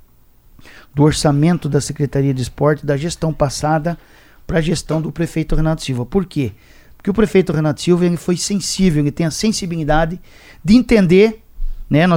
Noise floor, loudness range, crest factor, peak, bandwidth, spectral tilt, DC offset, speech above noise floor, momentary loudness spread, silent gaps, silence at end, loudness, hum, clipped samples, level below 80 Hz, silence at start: -48 dBFS; 4 LU; 16 dB; 0 dBFS; 16.5 kHz; -6 dB/octave; under 0.1%; 33 dB; 10 LU; none; 0 s; -17 LUFS; none; under 0.1%; -30 dBFS; 0.65 s